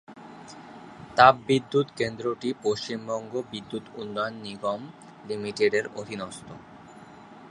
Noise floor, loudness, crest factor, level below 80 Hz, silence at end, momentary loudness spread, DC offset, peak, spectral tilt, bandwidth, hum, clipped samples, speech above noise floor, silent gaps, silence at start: -47 dBFS; -26 LUFS; 26 dB; -64 dBFS; 0 s; 25 LU; under 0.1%; -2 dBFS; -5 dB/octave; 11 kHz; none; under 0.1%; 21 dB; none; 0.1 s